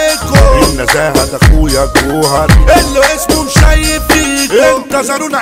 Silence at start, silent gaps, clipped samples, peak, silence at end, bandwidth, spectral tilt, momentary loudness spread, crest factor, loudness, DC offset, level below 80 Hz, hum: 0 s; none; 2%; 0 dBFS; 0 s; 16.5 kHz; -4.5 dB/octave; 4 LU; 8 dB; -9 LUFS; under 0.1%; -14 dBFS; none